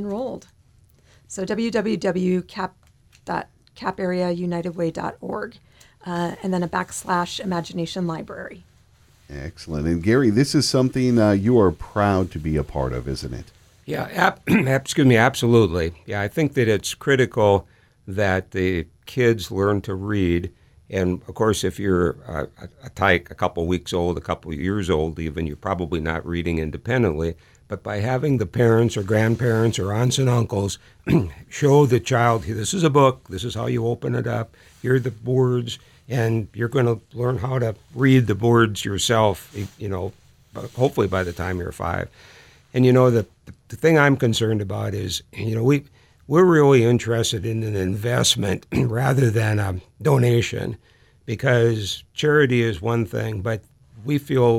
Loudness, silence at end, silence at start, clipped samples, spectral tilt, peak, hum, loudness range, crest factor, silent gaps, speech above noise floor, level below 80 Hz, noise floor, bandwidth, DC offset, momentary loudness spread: -21 LUFS; 0 s; 0 s; under 0.1%; -6 dB/octave; -2 dBFS; none; 7 LU; 20 dB; none; 35 dB; -44 dBFS; -55 dBFS; 15.5 kHz; under 0.1%; 14 LU